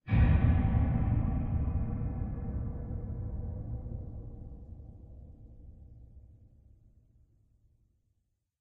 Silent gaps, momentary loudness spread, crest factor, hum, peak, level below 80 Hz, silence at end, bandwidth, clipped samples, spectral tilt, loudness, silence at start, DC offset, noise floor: none; 27 LU; 18 dB; none; -14 dBFS; -36 dBFS; 2.4 s; 4.1 kHz; under 0.1%; -9.5 dB/octave; -32 LUFS; 0.05 s; under 0.1%; -78 dBFS